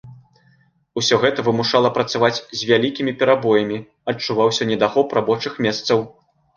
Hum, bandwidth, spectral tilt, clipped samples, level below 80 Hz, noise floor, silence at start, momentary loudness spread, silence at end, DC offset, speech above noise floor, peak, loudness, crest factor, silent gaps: none; 7.2 kHz; -4.5 dB/octave; under 0.1%; -60 dBFS; -58 dBFS; 0.05 s; 8 LU; 0.45 s; under 0.1%; 39 dB; -2 dBFS; -19 LUFS; 18 dB; none